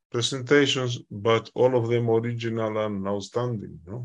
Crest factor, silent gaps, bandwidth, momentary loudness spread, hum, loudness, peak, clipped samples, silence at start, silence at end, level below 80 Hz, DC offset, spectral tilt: 18 dB; none; 10.5 kHz; 9 LU; none; -25 LUFS; -6 dBFS; under 0.1%; 0.15 s; 0 s; -68 dBFS; under 0.1%; -5 dB/octave